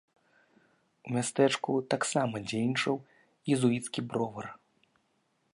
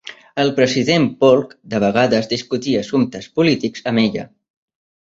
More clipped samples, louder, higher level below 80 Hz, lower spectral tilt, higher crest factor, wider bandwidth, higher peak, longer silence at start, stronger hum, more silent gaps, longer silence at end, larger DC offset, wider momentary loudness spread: neither; second, -31 LUFS vs -17 LUFS; second, -74 dBFS vs -56 dBFS; about the same, -5 dB/octave vs -5.5 dB/octave; about the same, 20 dB vs 16 dB; first, 11.5 kHz vs 7.8 kHz; second, -12 dBFS vs -2 dBFS; first, 1.05 s vs 0.05 s; neither; neither; about the same, 1 s vs 0.9 s; neither; first, 12 LU vs 7 LU